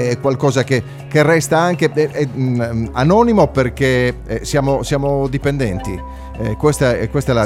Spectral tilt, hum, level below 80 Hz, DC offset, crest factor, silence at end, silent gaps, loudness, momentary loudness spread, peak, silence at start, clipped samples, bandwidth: -6 dB/octave; none; -32 dBFS; under 0.1%; 16 dB; 0 s; none; -16 LUFS; 8 LU; 0 dBFS; 0 s; under 0.1%; 15.5 kHz